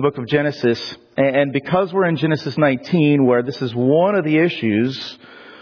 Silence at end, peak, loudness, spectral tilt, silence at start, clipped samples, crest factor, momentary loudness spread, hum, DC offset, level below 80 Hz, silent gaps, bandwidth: 0.05 s; -4 dBFS; -18 LUFS; -8 dB/octave; 0 s; under 0.1%; 14 dB; 7 LU; none; under 0.1%; -62 dBFS; none; 5.4 kHz